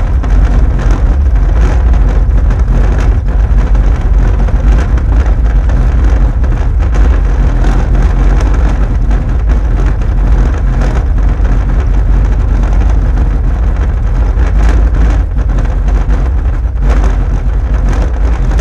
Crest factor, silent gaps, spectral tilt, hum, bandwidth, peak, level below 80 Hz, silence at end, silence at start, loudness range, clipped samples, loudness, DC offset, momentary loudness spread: 8 dB; none; -8 dB/octave; none; 7 kHz; 0 dBFS; -8 dBFS; 0 s; 0 s; 1 LU; under 0.1%; -12 LUFS; under 0.1%; 3 LU